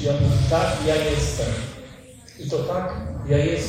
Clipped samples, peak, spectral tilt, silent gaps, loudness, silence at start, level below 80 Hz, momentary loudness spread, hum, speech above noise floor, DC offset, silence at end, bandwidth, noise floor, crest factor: under 0.1%; -8 dBFS; -6 dB/octave; none; -23 LUFS; 0 s; -36 dBFS; 15 LU; none; 22 dB; under 0.1%; 0 s; 15.5 kHz; -44 dBFS; 14 dB